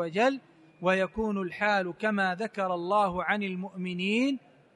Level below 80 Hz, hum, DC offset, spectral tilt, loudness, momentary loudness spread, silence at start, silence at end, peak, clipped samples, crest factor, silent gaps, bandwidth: -60 dBFS; none; under 0.1%; -6 dB/octave; -29 LUFS; 7 LU; 0 s; 0.4 s; -12 dBFS; under 0.1%; 18 dB; none; 11 kHz